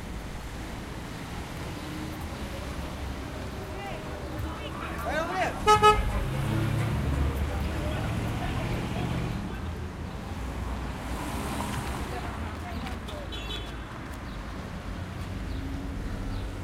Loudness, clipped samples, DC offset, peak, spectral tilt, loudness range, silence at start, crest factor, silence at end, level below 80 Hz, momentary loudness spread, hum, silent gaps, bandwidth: -31 LUFS; under 0.1%; under 0.1%; -6 dBFS; -5.5 dB/octave; 11 LU; 0 s; 24 dB; 0 s; -38 dBFS; 10 LU; none; none; 16 kHz